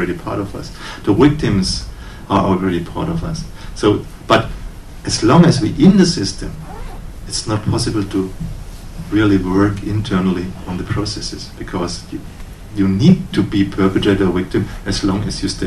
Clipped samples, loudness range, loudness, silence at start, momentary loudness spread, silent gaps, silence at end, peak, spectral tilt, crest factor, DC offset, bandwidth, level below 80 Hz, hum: under 0.1%; 5 LU; -16 LUFS; 0 s; 18 LU; none; 0 s; 0 dBFS; -6 dB/octave; 16 dB; under 0.1%; 13 kHz; -32 dBFS; none